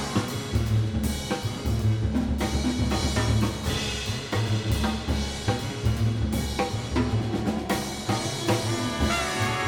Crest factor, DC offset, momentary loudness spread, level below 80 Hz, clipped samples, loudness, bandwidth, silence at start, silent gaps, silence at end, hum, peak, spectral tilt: 14 dB; under 0.1%; 3 LU; -34 dBFS; under 0.1%; -27 LUFS; 18.5 kHz; 0 s; none; 0 s; none; -10 dBFS; -5 dB/octave